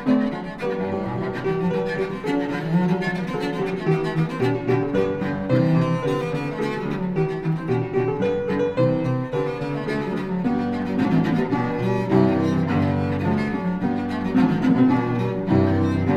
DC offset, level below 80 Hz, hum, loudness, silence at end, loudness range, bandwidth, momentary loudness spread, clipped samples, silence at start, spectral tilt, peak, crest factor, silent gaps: under 0.1%; -46 dBFS; none; -22 LUFS; 0 s; 3 LU; 10.5 kHz; 7 LU; under 0.1%; 0 s; -8.5 dB/octave; -6 dBFS; 16 dB; none